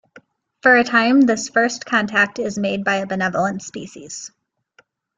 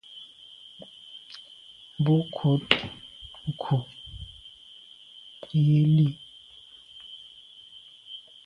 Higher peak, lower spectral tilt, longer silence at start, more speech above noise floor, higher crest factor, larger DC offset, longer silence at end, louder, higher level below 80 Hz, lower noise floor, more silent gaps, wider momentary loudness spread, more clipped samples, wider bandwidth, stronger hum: about the same, -2 dBFS vs 0 dBFS; second, -4 dB/octave vs -7.5 dB/octave; first, 0.65 s vs 0.1 s; first, 40 dB vs 29 dB; second, 18 dB vs 28 dB; neither; first, 0.9 s vs 0.25 s; first, -17 LUFS vs -25 LUFS; about the same, -62 dBFS vs -58 dBFS; first, -58 dBFS vs -51 dBFS; neither; second, 19 LU vs 24 LU; neither; first, 9.4 kHz vs 5.6 kHz; neither